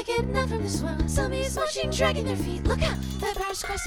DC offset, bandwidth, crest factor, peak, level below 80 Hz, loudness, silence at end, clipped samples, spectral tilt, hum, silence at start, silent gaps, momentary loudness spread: under 0.1%; 19.5 kHz; 18 dB; -8 dBFS; -34 dBFS; -27 LUFS; 0 s; under 0.1%; -4.5 dB/octave; none; 0 s; none; 5 LU